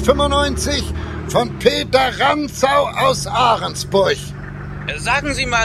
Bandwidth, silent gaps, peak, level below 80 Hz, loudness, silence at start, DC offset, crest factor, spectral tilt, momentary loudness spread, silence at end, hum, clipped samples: 15 kHz; none; 0 dBFS; -32 dBFS; -17 LUFS; 0 s; under 0.1%; 18 dB; -4 dB/octave; 10 LU; 0 s; none; under 0.1%